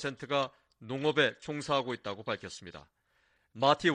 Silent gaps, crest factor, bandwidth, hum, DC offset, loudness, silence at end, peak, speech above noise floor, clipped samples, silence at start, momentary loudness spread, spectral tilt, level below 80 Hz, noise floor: none; 22 dB; 10.5 kHz; none; under 0.1%; -32 LUFS; 0 s; -10 dBFS; 40 dB; under 0.1%; 0 s; 17 LU; -4.5 dB/octave; -68 dBFS; -72 dBFS